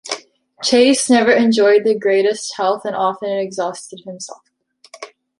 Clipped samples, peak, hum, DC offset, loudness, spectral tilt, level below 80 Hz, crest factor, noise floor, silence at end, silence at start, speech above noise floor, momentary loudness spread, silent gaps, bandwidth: under 0.1%; -2 dBFS; none; under 0.1%; -15 LUFS; -3 dB/octave; -66 dBFS; 16 dB; -46 dBFS; 0.35 s; 0.05 s; 30 dB; 20 LU; none; 11.5 kHz